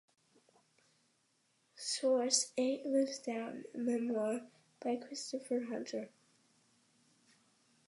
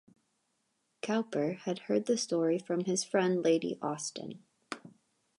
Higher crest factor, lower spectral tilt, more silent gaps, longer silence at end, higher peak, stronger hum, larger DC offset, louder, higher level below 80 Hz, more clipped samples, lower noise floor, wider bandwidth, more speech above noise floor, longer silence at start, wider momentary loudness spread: first, 24 dB vs 18 dB; second, -2.5 dB/octave vs -4.5 dB/octave; neither; first, 1.8 s vs 0.5 s; about the same, -16 dBFS vs -16 dBFS; neither; neither; second, -37 LUFS vs -32 LUFS; second, under -90 dBFS vs -84 dBFS; neither; about the same, -77 dBFS vs -78 dBFS; about the same, 11.5 kHz vs 11.5 kHz; second, 40 dB vs 47 dB; first, 1.75 s vs 1.05 s; second, 12 LU vs 16 LU